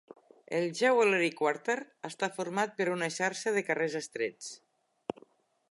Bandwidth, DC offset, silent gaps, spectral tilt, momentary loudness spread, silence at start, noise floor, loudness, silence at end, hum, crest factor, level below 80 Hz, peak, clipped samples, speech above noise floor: 11.5 kHz; under 0.1%; none; -4 dB/octave; 18 LU; 0.5 s; -64 dBFS; -31 LUFS; 1.15 s; none; 18 dB; -84 dBFS; -14 dBFS; under 0.1%; 33 dB